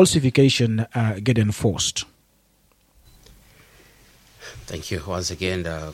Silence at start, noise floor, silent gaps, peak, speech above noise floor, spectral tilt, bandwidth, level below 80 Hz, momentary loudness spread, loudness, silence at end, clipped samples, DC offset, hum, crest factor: 0 s; -61 dBFS; none; -2 dBFS; 40 dB; -5 dB/octave; 16 kHz; -46 dBFS; 20 LU; -22 LUFS; 0 s; under 0.1%; under 0.1%; none; 20 dB